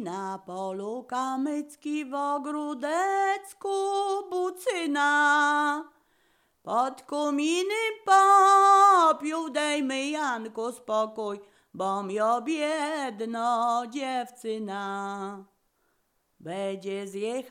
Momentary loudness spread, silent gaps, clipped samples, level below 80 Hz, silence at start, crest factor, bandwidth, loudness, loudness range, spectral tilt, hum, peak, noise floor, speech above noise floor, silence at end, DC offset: 16 LU; none; under 0.1%; -82 dBFS; 0 s; 18 dB; 16 kHz; -26 LUFS; 10 LU; -3 dB/octave; none; -8 dBFS; -72 dBFS; 46 dB; 0 s; under 0.1%